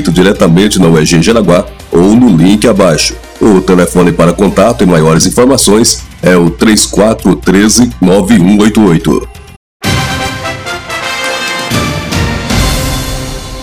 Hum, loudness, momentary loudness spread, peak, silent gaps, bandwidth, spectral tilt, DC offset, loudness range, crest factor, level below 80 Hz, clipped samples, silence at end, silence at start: none; -8 LUFS; 9 LU; 0 dBFS; 9.56-9.80 s; over 20 kHz; -5 dB/octave; 1%; 6 LU; 8 dB; -24 dBFS; 7%; 0 s; 0 s